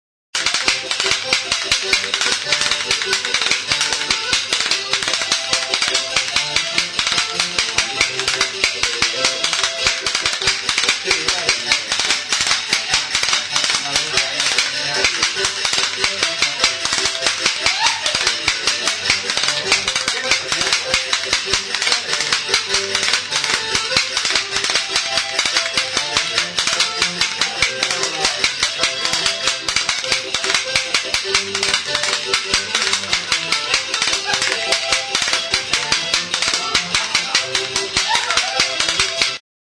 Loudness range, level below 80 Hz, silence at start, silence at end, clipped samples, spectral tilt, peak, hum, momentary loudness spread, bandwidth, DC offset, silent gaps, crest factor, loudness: 1 LU; -48 dBFS; 0.35 s; 0.35 s; under 0.1%; 0.5 dB/octave; 0 dBFS; none; 2 LU; 11 kHz; under 0.1%; none; 20 dB; -16 LUFS